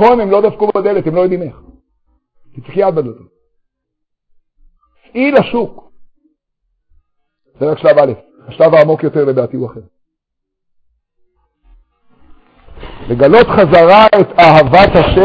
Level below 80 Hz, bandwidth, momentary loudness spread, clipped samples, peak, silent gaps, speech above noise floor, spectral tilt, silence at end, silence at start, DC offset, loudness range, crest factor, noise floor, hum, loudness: -36 dBFS; 8 kHz; 16 LU; 0.4%; 0 dBFS; none; 65 dB; -8 dB/octave; 0 s; 0 s; under 0.1%; 13 LU; 12 dB; -74 dBFS; none; -9 LUFS